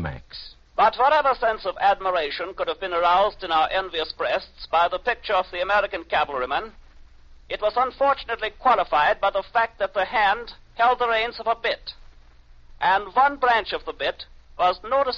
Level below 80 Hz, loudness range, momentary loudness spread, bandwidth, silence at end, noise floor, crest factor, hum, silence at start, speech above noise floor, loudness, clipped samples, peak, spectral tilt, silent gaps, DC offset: -48 dBFS; 3 LU; 9 LU; 7.2 kHz; 0 s; -49 dBFS; 16 dB; none; 0 s; 26 dB; -22 LUFS; under 0.1%; -8 dBFS; 0 dB/octave; none; under 0.1%